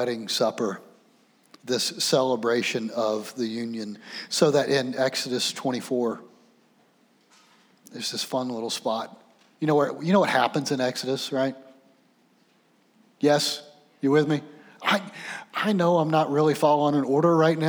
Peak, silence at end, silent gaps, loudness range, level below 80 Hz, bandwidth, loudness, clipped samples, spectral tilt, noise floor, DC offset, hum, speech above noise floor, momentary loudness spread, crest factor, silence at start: -6 dBFS; 0 s; none; 7 LU; -84 dBFS; over 20 kHz; -25 LUFS; under 0.1%; -4.5 dB/octave; -63 dBFS; under 0.1%; none; 39 dB; 12 LU; 20 dB; 0 s